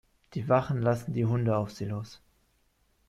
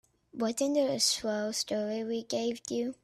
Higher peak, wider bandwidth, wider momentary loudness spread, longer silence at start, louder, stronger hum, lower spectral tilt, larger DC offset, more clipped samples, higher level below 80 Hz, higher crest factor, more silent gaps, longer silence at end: about the same, -12 dBFS vs -14 dBFS; second, 12.5 kHz vs 14.5 kHz; first, 12 LU vs 8 LU; about the same, 0.3 s vs 0.35 s; about the same, -29 LUFS vs -31 LUFS; neither; first, -8 dB/octave vs -2.5 dB/octave; neither; neither; first, -60 dBFS vs -72 dBFS; about the same, 18 dB vs 18 dB; neither; first, 0.9 s vs 0.1 s